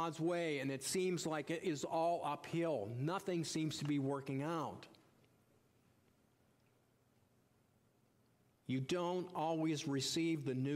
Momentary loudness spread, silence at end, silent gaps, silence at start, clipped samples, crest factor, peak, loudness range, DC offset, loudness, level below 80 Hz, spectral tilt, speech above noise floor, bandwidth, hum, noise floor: 4 LU; 0 s; none; 0 s; under 0.1%; 14 dB; -28 dBFS; 9 LU; under 0.1%; -40 LUFS; -82 dBFS; -5 dB/octave; 35 dB; 16 kHz; none; -74 dBFS